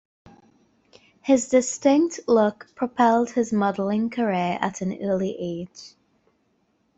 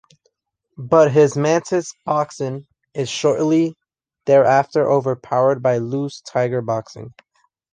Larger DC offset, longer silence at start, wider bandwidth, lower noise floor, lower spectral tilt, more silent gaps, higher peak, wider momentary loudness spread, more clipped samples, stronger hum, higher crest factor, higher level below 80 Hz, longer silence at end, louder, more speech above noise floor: neither; first, 1.25 s vs 0.8 s; second, 8.2 kHz vs 9.8 kHz; about the same, -68 dBFS vs -70 dBFS; about the same, -5.5 dB/octave vs -6 dB/octave; neither; second, -6 dBFS vs -2 dBFS; about the same, 12 LU vs 13 LU; neither; neither; about the same, 18 dB vs 18 dB; about the same, -64 dBFS vs -62 dBFS; first, 1.1 s vs 0.65 s; second, -23 LUFS vs -18 LUFS; second, 46 dB vs 52 dB